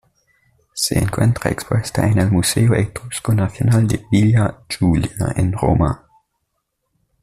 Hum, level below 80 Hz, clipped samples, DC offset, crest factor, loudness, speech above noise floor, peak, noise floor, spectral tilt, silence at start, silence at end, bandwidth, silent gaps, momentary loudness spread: none; -38 dBFS; under 0.1%; under 0.1%; 14 dB; -18 LUFS; 56 dB; -4 dBFS; -73 dBFS; -6 dB/octave; 0.75 s; 1.25 s; 14.5 kHz; none; 6 LU